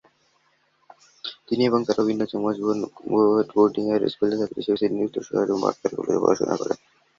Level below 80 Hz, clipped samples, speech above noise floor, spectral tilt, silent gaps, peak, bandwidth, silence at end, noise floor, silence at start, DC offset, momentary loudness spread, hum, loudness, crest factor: -64 dBFS; under 0.1%; 43 dB; -6 dB/octave; none; -4 dBFS; 7.4 kHz; 0.45 s; -65 dBFS; 1.25 s; under 0.1%; 9 LU; none; -23 LUFS; 20 dB